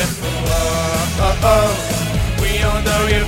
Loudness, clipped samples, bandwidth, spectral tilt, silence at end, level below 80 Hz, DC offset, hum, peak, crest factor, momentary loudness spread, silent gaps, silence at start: -17 LUFS; under 0.1%; 16.5 kHz; -4.5 dB/octave; 0 s; -22 dBFS; under 0.1%; none; 0 dBFS; 16 dB; 6 LU; none; 0 s